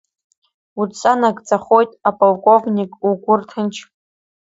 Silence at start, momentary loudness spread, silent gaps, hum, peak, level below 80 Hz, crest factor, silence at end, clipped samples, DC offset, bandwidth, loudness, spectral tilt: 0.75 s; 11 LU; none; none; 0 dBFS; -64 dBFS; 18 dB; 0.7 s; under 0.1%; under 0.1%; 8 kHz; -16 LUFS; -6 dB/octave